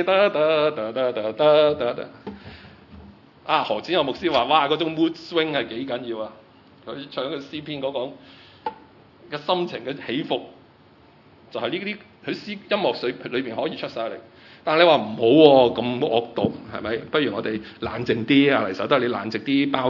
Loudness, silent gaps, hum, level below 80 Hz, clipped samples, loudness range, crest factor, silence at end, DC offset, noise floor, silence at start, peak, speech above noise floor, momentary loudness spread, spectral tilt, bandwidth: -22 LUFS; none; none; -62 dBFS; under 0.1%; 11 LU; 22 dB; 0 s; under 0.1%; -52 dBFS; 0 s; 0 dBFS; 31 dB; 16 LU; -7 dB/octave; 6 kHz